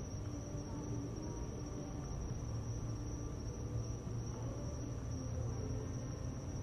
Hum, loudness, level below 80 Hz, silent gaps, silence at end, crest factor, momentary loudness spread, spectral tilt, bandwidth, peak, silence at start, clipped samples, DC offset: none; -44 LUFS; -50 dBFS; none; 0 s; 14 dB; 3 LU; -6.5 dB/octave; 11 kHz; -28 dBFS; 0 s; under 0.1%; under 0.1%